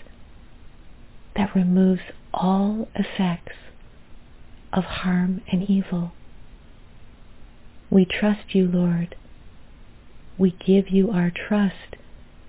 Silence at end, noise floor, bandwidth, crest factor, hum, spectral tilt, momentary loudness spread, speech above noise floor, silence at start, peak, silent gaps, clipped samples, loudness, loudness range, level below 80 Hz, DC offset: 0 s; -44 dBFS; 4 kHz; 18 dB; none; -11.5 dB/octave; 14 LU; 23 dB; 0 s; -6 dBFS; none; under 0.1%; -22 LUFS; 4 LU; -46 dBFS; under 0.1%